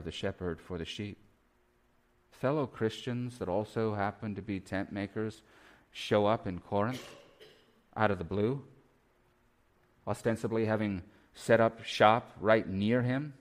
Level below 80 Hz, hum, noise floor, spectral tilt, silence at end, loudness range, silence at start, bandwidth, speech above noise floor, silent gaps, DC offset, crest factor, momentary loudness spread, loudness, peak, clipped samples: -62 dBFS; none; -70 dBFS; -6.5 dB/octave; 0.1 s; 7 LU; 0 s; 15 kHz; 38 dB; none; under 0.1%; 24 dB; 14 LU; -32 LUFS; -8 dBFS; under 0.1%